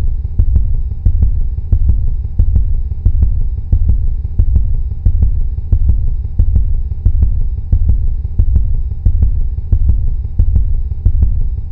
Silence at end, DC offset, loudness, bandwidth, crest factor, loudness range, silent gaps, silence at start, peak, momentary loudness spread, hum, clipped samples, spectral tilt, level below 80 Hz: 0 s; 0.6%; -17 LUFS; 1 kHz; 12 dB; 1 LU; none; 0 s; 0 dBFS; 5 LU; none; 0.1%; -12.5 dB/octave; -12 dBFS